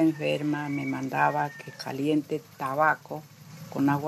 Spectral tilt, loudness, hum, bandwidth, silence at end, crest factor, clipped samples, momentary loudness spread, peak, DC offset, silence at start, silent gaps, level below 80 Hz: -6.5 dB/octave; -28 LUFS; none; 13.5 kHz; 0 s; 20 dB; under 0.1%; 14 LU; -8 dBFS; under 0.1%; 0 s; none; -72 dBFS